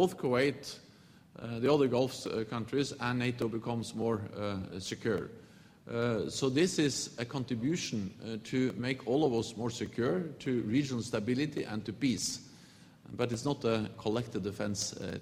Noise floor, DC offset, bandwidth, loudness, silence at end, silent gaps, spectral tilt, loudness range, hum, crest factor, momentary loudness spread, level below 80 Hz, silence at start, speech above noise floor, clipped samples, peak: -59 dBFS; under 0.1%; 15.5 kHz; -34 LUFS; 0 s; none; -5 dB/octave; 3 LU; none; 20 dB; 9 LU; -66 dBFS; 0 s; 26 dB; under 0.1%; -14 dBFS